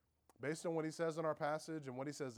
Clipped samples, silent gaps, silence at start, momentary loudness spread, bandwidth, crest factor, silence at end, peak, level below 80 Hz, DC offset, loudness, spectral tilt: under 0.1%; none; 0.4 s; 7 LU; 19 kHz; 16 dB; 0 s; -26 dBFS; -86 dBFS; under 0.1%; -43 LUFS; -5.5 dB/octave